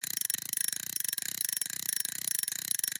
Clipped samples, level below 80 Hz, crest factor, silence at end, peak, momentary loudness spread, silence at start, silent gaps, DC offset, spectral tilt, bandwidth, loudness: under 0.1%; -82 dBFS; 22 dB; 0 s; -12 dBFS; 1 LU; 0 s; none; under 0.1%; 2 dB/octave; 17 kHz; -31 LUFS